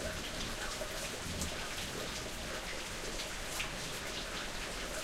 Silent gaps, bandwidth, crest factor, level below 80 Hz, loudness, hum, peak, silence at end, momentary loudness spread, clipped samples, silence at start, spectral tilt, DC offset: none; 16 kHz; 18 dB; -48 dBFS; -39 LUFS; none; -22 dBFS; 0 s; 2 LU; under 0.1%; 0 s; -2.5 dB/octave; under 0.1%